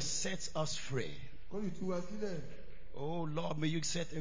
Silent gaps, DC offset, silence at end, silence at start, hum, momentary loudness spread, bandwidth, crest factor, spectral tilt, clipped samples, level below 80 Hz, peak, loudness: none; 1%; 0 s; 0 s; none; 12 LU; 7.8 kHz; 16 dB; -4 dB/octave; under 0.1%; -58 dBFS; -22 dBFS; -39 LUFS